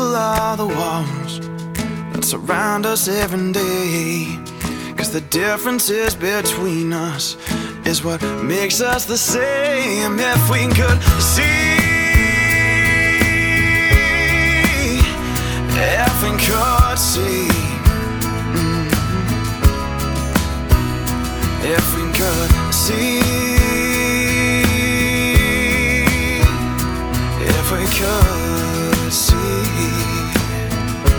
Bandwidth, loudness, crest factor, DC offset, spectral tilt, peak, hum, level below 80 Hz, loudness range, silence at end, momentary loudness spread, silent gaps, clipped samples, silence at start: over 20 kHz; -16 LUFS; 16 dB; under 0.1%; -4 dB/octave; 0 dBFS; none; -24 dBFS; 6 LU; 0 s; 8 LU; none; under 0.1%; 0 s